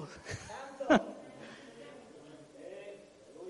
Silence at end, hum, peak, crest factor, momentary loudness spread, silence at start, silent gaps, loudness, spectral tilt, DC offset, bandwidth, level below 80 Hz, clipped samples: 0 s; none; -12 dBFS; 26 dB; 24 LU; 0 s; none; -34 LUFS; -5 dB/octave; under 0.1%; 11.5 kHz; -66 dBFS; under 0.1%